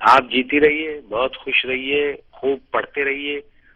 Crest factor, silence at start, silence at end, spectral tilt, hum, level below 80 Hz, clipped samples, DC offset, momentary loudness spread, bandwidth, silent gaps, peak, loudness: 18 dB; 0 s; 0.35 s; -4.5 dB/octave; none; -52 dBFS; under 0.1%; under 0.1%; 10 LU; 10.5 kHz; none; -2 dBFS; -20 LUFS